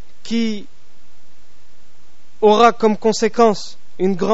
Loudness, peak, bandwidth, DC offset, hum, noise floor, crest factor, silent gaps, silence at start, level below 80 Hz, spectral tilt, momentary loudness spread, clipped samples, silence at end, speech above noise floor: -16 LUFS; 0 dBFS; 8 kHz; 7%; none; -53 dBFS; 18 dB; none; 0.25 s; -58 dBFS; -4 dB/octave; 14 LU; under 0.1%; 0 s; 38 dB